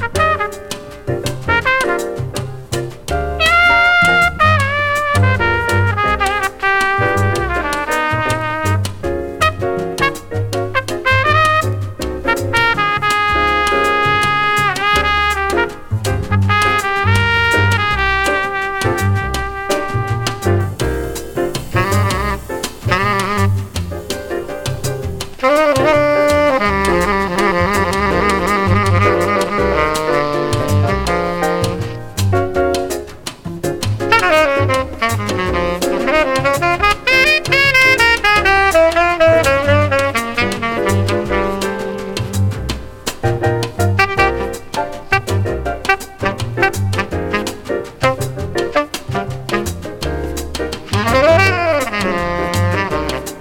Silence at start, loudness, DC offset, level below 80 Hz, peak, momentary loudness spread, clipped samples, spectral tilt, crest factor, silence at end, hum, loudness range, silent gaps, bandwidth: 0 s; -15 LUFS; under 0.1%; -32 dBFS; 0 dBFS; 11 LU; under 0.1%; -5 dB/octave; 16 dB; 0 s; none; 6 LU; none; 18 kHz